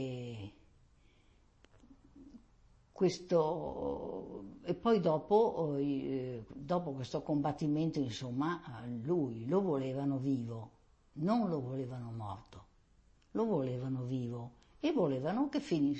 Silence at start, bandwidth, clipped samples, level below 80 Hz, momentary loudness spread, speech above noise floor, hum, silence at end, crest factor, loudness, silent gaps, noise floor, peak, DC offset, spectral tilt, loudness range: 0 s; 8.4 kHz; under 0.1%; -64 dBFS; 14 LU; 32 dB; none; 0 s; 18 dB; -36 LUFS; none; -67 dBFS; -18 dBFS; under 0.1%; -7.5 dB/octave; 5 LU